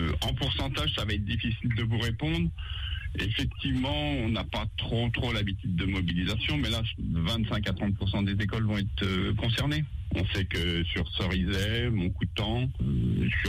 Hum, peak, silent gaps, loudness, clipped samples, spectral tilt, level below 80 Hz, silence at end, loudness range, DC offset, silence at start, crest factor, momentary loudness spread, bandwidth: none; -16 dBFS; none; -29 LUFS; under 0.1%; -6 dB/octave; -38 dBFS; 0 s; 1 LU; under 0.1%; 0 s; 12 dB; 3 LU; 15.5 kHz